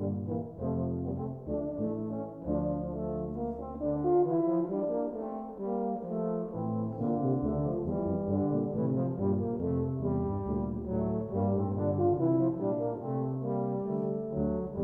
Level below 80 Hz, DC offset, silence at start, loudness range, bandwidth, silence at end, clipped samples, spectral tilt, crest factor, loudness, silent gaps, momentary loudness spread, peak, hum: -50 dBFS; under 0.1%; 0 s; 3 LU; 2.3 kHz; 0 s; under 0.1%; -13.5 dB/octave; 14 dB; -32 LUFS; none; 8 LU; -16 dBFS; none